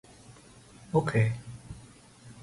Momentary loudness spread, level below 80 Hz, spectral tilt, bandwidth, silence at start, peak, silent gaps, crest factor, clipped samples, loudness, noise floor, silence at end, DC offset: 25 LU; -58 dBFS; -7.5 dB/octave; 11.5 kHz; 0.3 s; -12 dBFS; none; 20 dB; under 0.1%; -29 LUFS; -53 dBFS; 0 s; under 0.1%